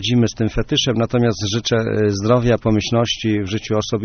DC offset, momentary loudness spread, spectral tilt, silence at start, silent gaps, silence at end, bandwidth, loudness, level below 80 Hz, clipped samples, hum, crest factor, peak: under 0.1%; 5 LU; -5 dB/octave; 0 s; none; 0 s; 6.6 kHz; -18 LUFS; -36 dBFS; under 0.1%; none; 16 dB; -2 dBFS